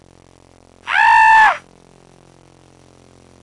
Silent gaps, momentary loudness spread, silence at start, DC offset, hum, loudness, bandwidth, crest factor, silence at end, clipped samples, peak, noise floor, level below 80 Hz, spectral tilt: none; 18 LU; 0.85 s; under 0.1%; none; -11 LUFS; 11 kHz; 14 dB; 1.85 s; under 0.1%; -2 dBFS; -48 dBFS; -54 dBFS; -1 dB/octave